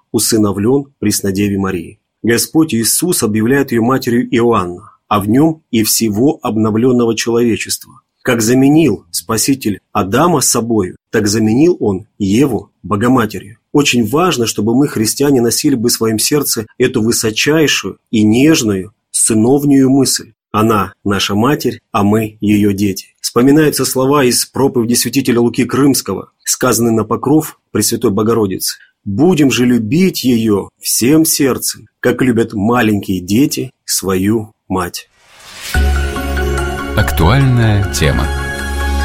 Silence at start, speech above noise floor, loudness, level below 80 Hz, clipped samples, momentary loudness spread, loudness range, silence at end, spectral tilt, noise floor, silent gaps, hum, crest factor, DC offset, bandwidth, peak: 0.15 s; 24 dB; -13 LUFS; -28 dBFS; under 0.1%; 8 LU; 3 LU; 0 s; -4.5 dB/octave; -36 dBFS; none; none; 12 dB; 0.2%; 16.5 kHz; 0 dBFS